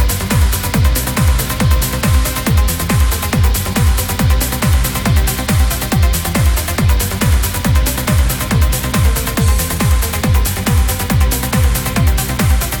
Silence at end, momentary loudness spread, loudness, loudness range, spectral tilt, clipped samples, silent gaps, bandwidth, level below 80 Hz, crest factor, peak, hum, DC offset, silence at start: 0 s; 1 LU; -14 LUFS; 0 LU; -4.5 dB/octave; under 0.1%; none; over 20 kHz; -16 dBFS; 12 dB; 0 dBFS; none; under 0.1%; 0 s